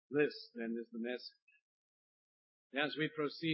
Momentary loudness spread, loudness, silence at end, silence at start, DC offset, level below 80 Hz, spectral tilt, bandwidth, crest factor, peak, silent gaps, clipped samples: 9 LU; -40 LUFS; 0 s; 0.1 s; under 0.1%; under -90 dBFS; -3.5 dB/octave; 5.6 kHz; 20 dB; -20 dBFS; 1.42-1.47 s, 1.62-2.70 s; under 0.1%